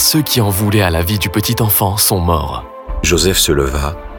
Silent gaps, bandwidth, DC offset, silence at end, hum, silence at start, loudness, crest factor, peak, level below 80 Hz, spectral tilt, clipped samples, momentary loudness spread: none; over 20 kHz; under 0.1%; 0 s; none; 0 s; -13 LUFS; 14 dB; 0 dBFS; -26 dBFS; -4 dB/octave; under 0.1%; 8 LU